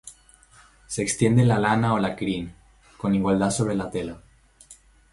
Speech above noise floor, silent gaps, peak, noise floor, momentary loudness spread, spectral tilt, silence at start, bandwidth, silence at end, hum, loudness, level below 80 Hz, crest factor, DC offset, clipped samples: 32 dB; none; -6 dBFS; -54 dBFS; 14 LU; -6 dB/octave; 0.05 s; 11.5 kHz; 0.4 s; none; -23 LUFS; -50 dBFS; 20 dB; under 0.1%; under 0.1%